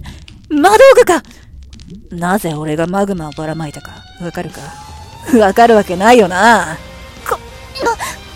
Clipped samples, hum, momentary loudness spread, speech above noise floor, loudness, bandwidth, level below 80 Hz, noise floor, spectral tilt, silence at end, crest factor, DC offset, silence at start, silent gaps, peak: 0.4%; none; 23 LU; 23 dB; -11 LUFS; 16.5 kHz; -38 dBFS; -35 dBFS; -4.5 dB/octave; 0 s; 14 dB; under 0.1%; 0.05 s; none; 0 dBFS